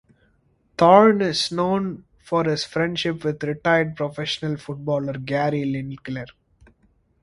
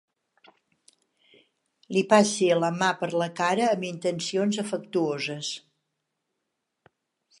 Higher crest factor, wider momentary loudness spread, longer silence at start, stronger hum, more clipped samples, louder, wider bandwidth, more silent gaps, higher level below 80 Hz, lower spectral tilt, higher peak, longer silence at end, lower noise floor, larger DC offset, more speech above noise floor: about the same, 22 dB vs 22 dB; first, 17 LU vs 10 LU; second, 0.8 s vs 1.9 s; neither; neither; first, -21 LUFS vs -25 LUFS; about the same, 11.5 kHz vs 11.5 kHz; neither; first, -56 dBFS vs -78 dBFS; about the same, -5.5 dB/octave vs -4.5 dB/octave; first, 0 dBFS vs -4 dBFS; second, 0.95 s vs 1.8 s; second, -63 dBFS vs -81 dBFS; neither; second, 42 dB vs 56 dB